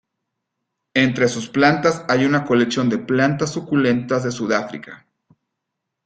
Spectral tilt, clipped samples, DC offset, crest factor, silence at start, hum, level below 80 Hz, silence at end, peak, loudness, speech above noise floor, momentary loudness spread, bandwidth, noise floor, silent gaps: -5.5 dB/octave; under 0.1%; under 0.1%; 18 dB; 0.95 s; none; -58 dBFS; 1.1 s; -2 dBFS; -19 LUFS; 61 dB; 6 LU; 9.2 kHz; -80 dBFS; none